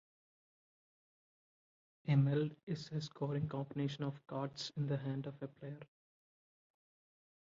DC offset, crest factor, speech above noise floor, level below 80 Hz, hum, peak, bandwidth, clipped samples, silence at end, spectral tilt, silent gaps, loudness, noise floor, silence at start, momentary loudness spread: under 0.1%; 20 dB; over 51 dB; -76 dBFS; none; -22 dBFS; 7.4 kHz; under 0.1%; 1.6 s; -7 dB/octave; 2.63-2.67 s; -40 LUFS; under -90 dBFS; 2.05 s; 15 LU